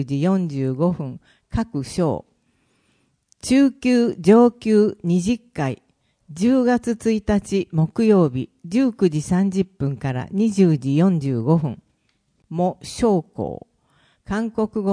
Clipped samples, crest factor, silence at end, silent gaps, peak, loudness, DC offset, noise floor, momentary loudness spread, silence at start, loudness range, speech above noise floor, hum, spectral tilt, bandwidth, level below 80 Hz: under 0.1%; 18 dB; 0 s; none; -2 dBFS; -20 LUFS; under 0.1%; -67 dBFS; 13 LU; 0 s; 6 LU; 47 dB; none; -7.5 dB/octave; 10.5 kHz; -46 dBFS